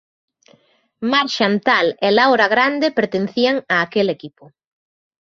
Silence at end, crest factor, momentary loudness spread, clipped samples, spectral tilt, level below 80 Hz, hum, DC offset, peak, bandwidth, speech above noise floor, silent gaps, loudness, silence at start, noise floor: 0.95 s; 18 dB; 7 LU; under 0.1%; -5 dB/octave; -64 dBFS; none; under 0.1%; -2 dBFS; 7.6 kHz; 41 dB; none; -16 LUFS; 1 s; -57 dBFS